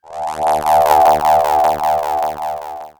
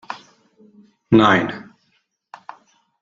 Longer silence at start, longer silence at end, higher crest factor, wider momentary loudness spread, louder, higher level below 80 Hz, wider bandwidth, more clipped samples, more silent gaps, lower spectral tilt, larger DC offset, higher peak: about the same, 0.1 s vs 0.1 s; second, 0.1 s vs 1.4 s; second, 14 dB vs 20 dB; second, 13 LU vs 27 LU; about the same, -14 LUFS vs -16 LUFS; first, -44 dBFS vs -56 dBFS; first, over 20 kHz vs 7.4 kHz; neither; neither; second, -3.5 dB/octave vs -6.5 dB/octave; neither; about the same, 0 dBFS vs -2 dBFS